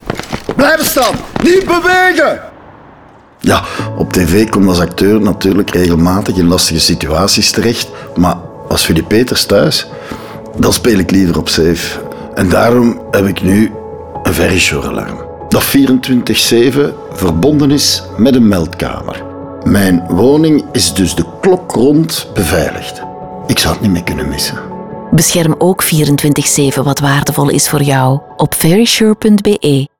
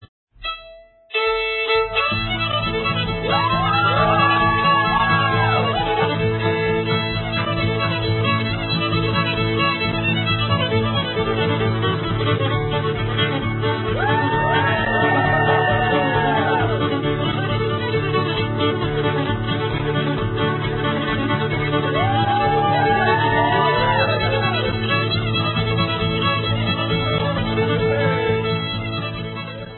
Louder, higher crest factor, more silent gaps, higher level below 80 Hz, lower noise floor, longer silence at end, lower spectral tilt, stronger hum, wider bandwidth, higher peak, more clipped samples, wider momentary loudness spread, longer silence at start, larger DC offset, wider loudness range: first, -10 LUFS vs -19 LUFS; second, 10 dB vs 16 dB; second, none vs 0.08-0.27 s; about the same, -34 dBFS vs -38 dBFS; second, -39 dBFS vs -44 dBFS; first, 0.15 s vs 0 s; second, -4.5 dB/octave vs -11 dB/octave; neither; first, over 20 kHz vs 4.3 kHz; first, 0 dBFS vs -4 dBFS; neither; first, 11 LU vs 5 LU; about the same, 0.05 s vs 0 s; neither; about the same, 3 LU vs 4 LU